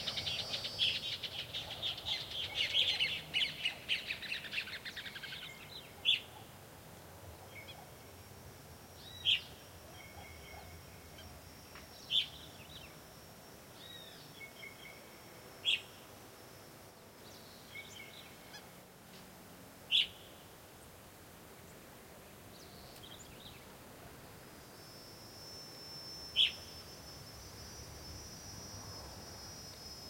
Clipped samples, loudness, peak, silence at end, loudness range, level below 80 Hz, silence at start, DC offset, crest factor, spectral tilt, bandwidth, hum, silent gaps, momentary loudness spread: under 0.1%; -37 LUFS; -18 dBFS; 0 s; 17 LU; -66 dBFS; 0 s; under 0.1%; 26 dB; -1.5 dB/octave; 16.5 kHz; none; none; 22 LU